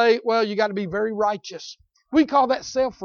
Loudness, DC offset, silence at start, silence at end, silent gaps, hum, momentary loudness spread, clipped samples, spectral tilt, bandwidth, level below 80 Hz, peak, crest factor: -22 LUFS; under 0.1%; 0 s; 0 s; none; none; 15 LU; under 0.1%; -5 dB/octave; 7 kHz; -58 dBFS; -6 dBFS; 16 dB